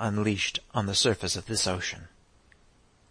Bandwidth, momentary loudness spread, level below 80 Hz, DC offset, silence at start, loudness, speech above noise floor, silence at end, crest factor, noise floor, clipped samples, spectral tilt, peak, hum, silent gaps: 10.5 kHz; 8 LU; -56 dBFS; under 0.1%; 0 s; -27 LUFS; 33 dB; 1.05 s; 18 dB; -61 dBFS; under 0.1%; -3.5 dB/octave; -12 dBFS; none; none